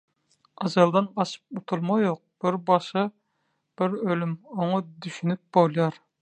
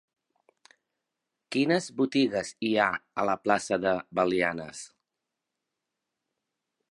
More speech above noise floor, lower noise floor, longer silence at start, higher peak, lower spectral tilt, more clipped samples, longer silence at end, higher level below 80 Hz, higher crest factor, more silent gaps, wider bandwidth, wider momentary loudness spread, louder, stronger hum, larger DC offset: second, 50 dB vs 59 dB; second, -75 dBFS vs -86 dBFS; second, 0.6 s vs 1.5 s; about the same, -4 dBFS vs -6 dBFS; first, -7 dB/octave vs -4.5 dB/octave; neither; second, 0.3 s vs 2.05 s; second, -74 dBFS vs -68 dBFS; about the same, 20 dB vs 24 dB; neither; second, 9.2 kHz vs 11.5 kHz; about the same, 10 LU vs 9 LU; about the same, -26 LUFS vs -27 LUFS; neither; neither